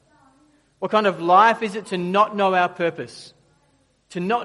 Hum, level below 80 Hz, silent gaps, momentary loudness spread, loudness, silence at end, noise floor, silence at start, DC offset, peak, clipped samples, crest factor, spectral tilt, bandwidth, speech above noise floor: none; -70 dBFS; none; 20 LU; -19 LUFS; 0 s; -62 dBFS; 0.8 s; under 0.1%; -2 dBFS; under 0.1%; 20 dB; -5.5 dB/octave; 11.5 kHz; 43 dB